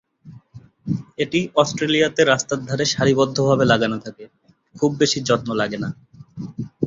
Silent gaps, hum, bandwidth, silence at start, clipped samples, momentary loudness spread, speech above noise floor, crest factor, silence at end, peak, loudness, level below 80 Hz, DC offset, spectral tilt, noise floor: none; none; 7.8 kHz; 0.25 s; under 0.1%; 16 LU; 26 dB; 18 dB; 0 s; -2 dBFS; -20 LUFS; -54 dBFS; under 0.1%; -4.5 dB/octave; -45 dBFS